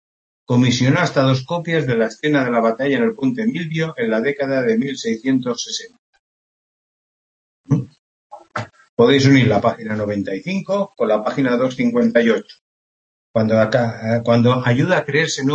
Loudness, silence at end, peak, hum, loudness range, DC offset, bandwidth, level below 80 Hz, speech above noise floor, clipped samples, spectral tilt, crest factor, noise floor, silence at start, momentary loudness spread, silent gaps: -18 LUFS; 0 s; 0 dBFS; none; 7 LU; under 0.1%; 8.4 kHz; -58 dBFS; over 73 dB; under 0.1%; -6 dB/octave; 18 dB; under -90 dBFS; 0.5 s; 9 LU; 5.99-6.13 s, 6.19-7.64 s, 7.99-8.30 s, 8.89-8.97 s, 12.61-13.34 s